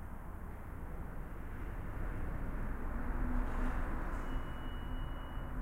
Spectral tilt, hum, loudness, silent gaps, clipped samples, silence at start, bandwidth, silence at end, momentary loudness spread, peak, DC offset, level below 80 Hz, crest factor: -7.5 dB/octave; none; -44 LUFS; none; under 0.1%; 0 s; 15 kHz; 0 s; 8 LU; -24 dBFS; under 0.1%; -40 dBFS; 14 dB